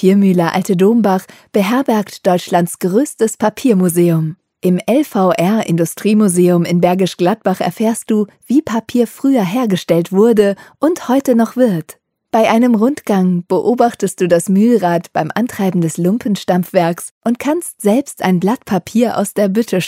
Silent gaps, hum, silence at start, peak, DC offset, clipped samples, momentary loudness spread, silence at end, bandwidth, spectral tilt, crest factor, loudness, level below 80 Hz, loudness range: 17.11-17.21 s; none; 0 s; 0 dBFS; under 0.1%; under 0.1%; 6 LU; 0 s; 16 kHz; -6.5 dB/octave; 14 dB; -14 LUFS; -60 dBFS; 2 LU